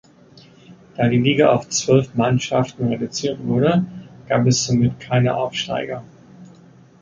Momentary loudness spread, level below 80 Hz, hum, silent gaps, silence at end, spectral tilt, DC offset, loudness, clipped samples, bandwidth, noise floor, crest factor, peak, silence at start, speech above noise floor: 9 LU; -52 dBFS; none; none; 0.55 s; -5.5 dB/octave; under 0.1%; -19 LUFS; under 0.1%; 7.6 kHz; -48 dBFS; 18 dB; -2 dBFS; 0.7 s; 29 dB